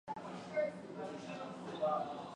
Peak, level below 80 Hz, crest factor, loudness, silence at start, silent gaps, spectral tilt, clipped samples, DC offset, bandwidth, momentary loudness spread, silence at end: -26 dBFS; -78 dBFS; 16 dB; -41 LUFS; 0.05 s; none; -6 dB/octave; under 0.1%; under 0.1%; 10.5 kHz; 9 LU; 0 s